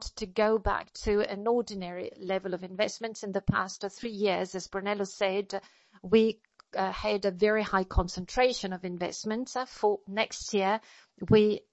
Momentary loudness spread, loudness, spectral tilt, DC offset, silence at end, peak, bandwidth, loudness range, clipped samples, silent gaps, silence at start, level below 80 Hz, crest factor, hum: 12 LU; -30 LUFS; -5 dB/octave; under 0.1%; 0.15 s; -10 dBFS; 8.2 kHz; 3 LU; under 0.1%; none; 0 s; -44 dBFS; 20 dB; none